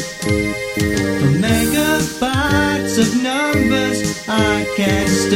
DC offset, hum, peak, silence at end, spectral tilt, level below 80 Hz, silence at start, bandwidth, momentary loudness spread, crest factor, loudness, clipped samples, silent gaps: under 0.1%; none; -2 dBFS; 0 s; -4.5 dB/octave; -34 dBFS; 0 s; 16.5 kHz; 4 LU; 14 dB; -16 LUFS; under 0.1%; none